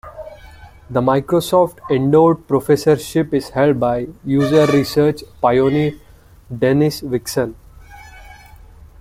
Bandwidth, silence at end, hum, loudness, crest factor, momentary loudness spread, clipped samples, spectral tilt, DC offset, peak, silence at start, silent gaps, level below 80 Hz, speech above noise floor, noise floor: 16 kHz; 0.65 s; none; -16 LUFS; 16 dB; 10 LU; under 0.1%; -6.5 dB/octave; under 0.1%; -2 dBFS; 0.05 s; none; -44 dBFS; 26 dB; -41 dBFS